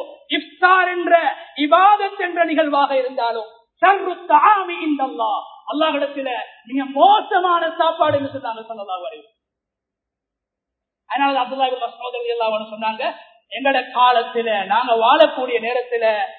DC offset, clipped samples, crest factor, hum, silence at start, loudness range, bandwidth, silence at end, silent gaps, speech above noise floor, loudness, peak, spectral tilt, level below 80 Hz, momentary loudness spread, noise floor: under 0.1%; under 0.1%; 18 dB; none; 0 s; 8 LU; 4.5 kHz; 0 s; none; 66 dB; -18 LUFS; 0 dBFS; -7 dB/octave; -72 dBFS; 13 LU; -83 dBFS